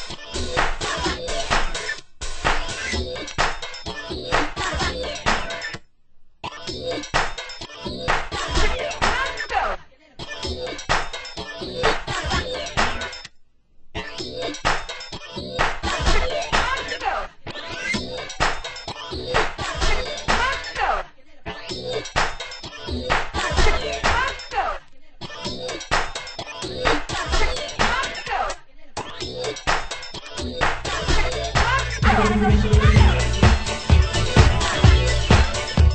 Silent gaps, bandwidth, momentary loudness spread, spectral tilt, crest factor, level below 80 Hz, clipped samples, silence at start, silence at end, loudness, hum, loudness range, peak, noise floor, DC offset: none; 8.8 kHz; 14 LU; -4.5 dB/octave; 22 dB; -26 dBFS; under 0.1%; 0 s; 0 s; -23 LUFS; none; 8 LU; 0 dBFS; -50 dBFS; under 0.1%